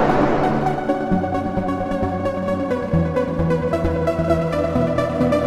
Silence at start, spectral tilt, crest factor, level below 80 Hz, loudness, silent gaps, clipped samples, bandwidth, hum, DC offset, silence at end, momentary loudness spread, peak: 0 s; -8 dB/octave; 16 dB; -36 dBFS; -20 LUFS; none; under 0.1%; 13 kHz; none; under 0.1%; 0 s; 4 LU; -4 dBFS